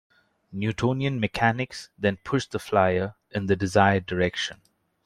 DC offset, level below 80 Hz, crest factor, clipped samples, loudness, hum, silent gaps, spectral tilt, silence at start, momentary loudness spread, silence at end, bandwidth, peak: under 0.1%; -56 dBFS; 22 dB; under 0.1%; -25 LUFS; none; none; -6 dB/octave; 0.5 s; 10 LU; 0.5 s; 13.5 kHz; -4 dBFS